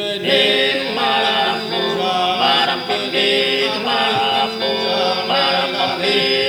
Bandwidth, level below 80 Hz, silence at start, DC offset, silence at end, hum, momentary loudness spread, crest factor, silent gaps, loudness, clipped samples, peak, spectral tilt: over 20 kHz; -60 dBFS; 0 s; under 0.1%; 0 s; none; 4 LU; 16 dB; none; -16 LUFS; under 0.1%; -2 dBFS; -3.5 dB/octave